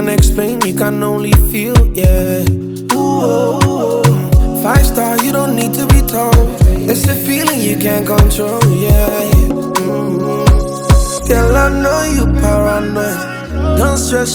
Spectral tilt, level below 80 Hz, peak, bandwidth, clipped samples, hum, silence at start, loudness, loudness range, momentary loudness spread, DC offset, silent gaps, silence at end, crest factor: -5.5 dB/octave; -16 dBFS; 0 dBFS; 19.5 kHz; under 0.1%; none; 0 s; -12 LUFS; 1 LU; 5 LU; under 0.1%; none; 0 s; 12 dB